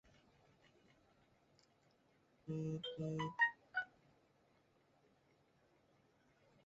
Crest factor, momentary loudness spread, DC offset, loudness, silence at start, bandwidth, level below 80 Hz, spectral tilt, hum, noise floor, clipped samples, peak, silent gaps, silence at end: 24 dB; 14 LU; under 0.1%; -42 LUFS; 2.45 s; 7.6 kHz; -80 dBFS; -3.5 dB/octave; none; -75 dBFS; under 0.1%; -24 dBFS; none; 2.8 s